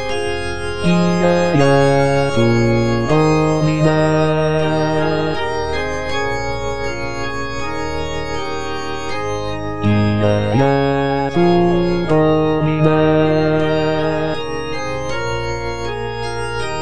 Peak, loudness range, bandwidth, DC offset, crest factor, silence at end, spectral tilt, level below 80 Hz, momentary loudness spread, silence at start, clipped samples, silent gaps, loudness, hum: 0 dBFS; 7 LU; 10.5 kHz; 4%; 16 dB; 0 s; -6.5 dB/octave; -36 dBFS; 9 LU; 0 s; under 0.1%; none; -17 LUFS; none